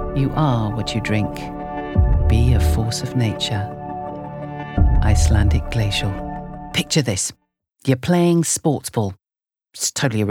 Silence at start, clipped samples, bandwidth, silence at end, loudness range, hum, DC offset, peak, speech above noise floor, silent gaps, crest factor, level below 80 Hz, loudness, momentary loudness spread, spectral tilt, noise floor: 0 s; under 0.1%; 16.5 kHz; 0 s; 1 LU; none; under 0.1%; -2 dBFS; 69 dB; none; 16 dB; -26 dBFS; -20 LUFS; 13 LU; -5 dB/octave; -87 dBFS